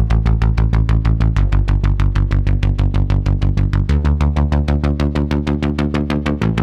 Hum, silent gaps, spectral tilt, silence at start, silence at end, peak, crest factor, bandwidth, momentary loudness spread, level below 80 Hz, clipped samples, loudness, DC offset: none; none; -8 dB/octave; 0 s; 0 s; -2 dBFS; 12 dB; 7.2 kHz; 3 LU; -18 dBFS; under 0.1%; -17 LUFS; under 0.1%